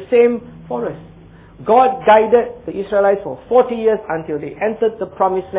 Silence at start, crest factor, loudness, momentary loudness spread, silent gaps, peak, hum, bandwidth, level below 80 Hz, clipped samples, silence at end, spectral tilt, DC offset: 0 s; 14 dB; -16 LUFS; 15 LU; none; -2 dBFS; none; 4 kHz; -50 dBFS; under 0.1%; 0 s; -9.5 dB/octave; under 0.1%